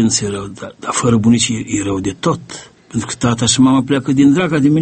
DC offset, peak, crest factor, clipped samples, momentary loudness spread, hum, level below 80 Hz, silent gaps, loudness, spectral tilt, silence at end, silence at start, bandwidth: under 0.1%; 0 dBFS; 14 dB; under 0.1%; 13 LU; none; -44 dBFS; none; -15 LUFS; -4.5 dB/octave; 0 s; 0 s; 8.8 kHz